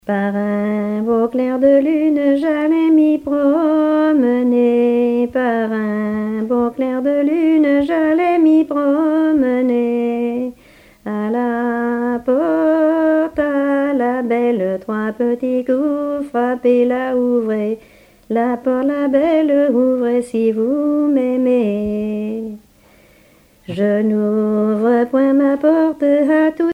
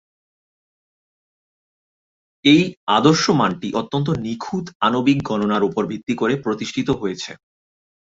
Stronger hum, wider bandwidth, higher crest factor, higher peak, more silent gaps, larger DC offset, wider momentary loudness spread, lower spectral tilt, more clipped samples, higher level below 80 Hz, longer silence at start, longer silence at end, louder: neither; first, 10 kHz vs 7.8 kHz; second, 14 dB vs 20 dB; about the same, -2 dBFS vs 0 dBFS; second, none vs 2.77-2.87 s, 4.75-4.80 s; neither; second, 7 LU vs 11 LU; first, -8 dB/octave vs -5.5 dB/octave; neither; about the same, -54 dBFS vs -54 dBFS; second, 0.05 s vs 2.45 s; second, 0 s vs 0.75 s; first, -16 LUFS vs -19 LUFS